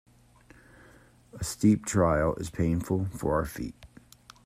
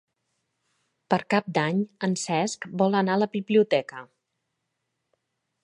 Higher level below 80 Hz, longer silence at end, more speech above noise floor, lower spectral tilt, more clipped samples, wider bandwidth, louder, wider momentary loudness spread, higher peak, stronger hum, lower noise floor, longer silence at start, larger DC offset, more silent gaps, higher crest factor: first, -48 dBFS vs -74 dBFS; second, 0.6 s vs 1.6 s; second, 30 dB vs 55 dB; about the same, -6.5 dB/octave vs -5.5 dB/octave; neither; first, 16 kHz vs 11.5 kHz; second, -28 LUFS vs -25 LUFS; first, 12 LU vs 6 LU; second, -10 dBFS vs -6 dBFS; neither; second, -57 dBFS vs -80 dBFS; first, 1.35 s vs 1.1 s; neither; neither; about the same, 18 dB vs 22 dB